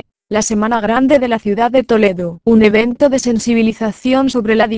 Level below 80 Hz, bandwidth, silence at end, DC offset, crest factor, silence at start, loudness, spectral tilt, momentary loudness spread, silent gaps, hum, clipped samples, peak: -42 dBFS; 8 kHz; 0 s; under 0.1%; 12 dB; 0.3 s; -13 LUFS; -5 dB/octave; 5 LU; none; none; 0.1%; 0 dBFS